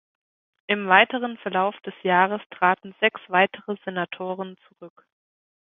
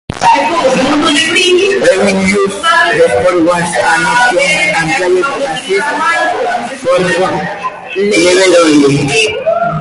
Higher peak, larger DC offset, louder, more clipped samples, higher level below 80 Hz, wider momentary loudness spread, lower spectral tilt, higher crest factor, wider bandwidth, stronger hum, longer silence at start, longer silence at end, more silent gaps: about the same, 0 dBFS vs 0 dBFS; neither; second, -23 LUFS vs -9 LUFS; neither; second, -74 dBFS vs -42 dBFS; first, 14 LU vs 7 LU; first, -8.5 dB/octave vs -3.5 dB/octave; first, 24 dB vs 10 dB; second, 3.9 kHz vs 11.5 kHz; neither; first, 0.7 s vs 0.1 s; first, 0.9 s vs 0 s; first, 2.46-2.50 s vs none